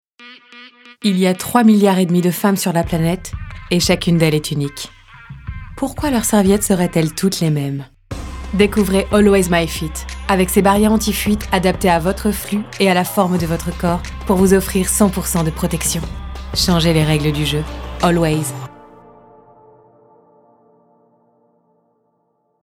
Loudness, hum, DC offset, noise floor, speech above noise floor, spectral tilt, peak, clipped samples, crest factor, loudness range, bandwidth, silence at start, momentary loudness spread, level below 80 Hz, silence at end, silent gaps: -16 LUFS; none; under 0.1%; -65 dBFS; 49 dB; -5 dB/octave; 0 dBFS; under 0.1%; 16 dB; 4 LU; 18 kHz; 0.2 s; 14 LU; -32 dBFS; 3.75 s; none